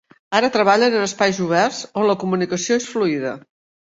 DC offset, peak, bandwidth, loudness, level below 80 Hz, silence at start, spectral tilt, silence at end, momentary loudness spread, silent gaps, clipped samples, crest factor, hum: under 0.1%; -2 dBFS; 8 kHz; -19 LUFS; -62 dBFS; 0.3 s; -4 dB/octave; 0.4 s; 6 LU; none; under 0.1%; 18 dB; none